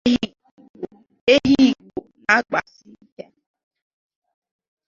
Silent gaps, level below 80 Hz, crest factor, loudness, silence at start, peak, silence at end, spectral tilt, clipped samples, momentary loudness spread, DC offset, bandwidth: 0.51-0.57 s, 0.70-0.74 s, 1.21-1.27 s; -52 dBFS; 20 dB; -18 LUFS; 0.05 s; -2 dBFS; 2.25 s; -4.5 dB/octave; under 0.1%; 21 LU; under 0.1%; 7.4 kHz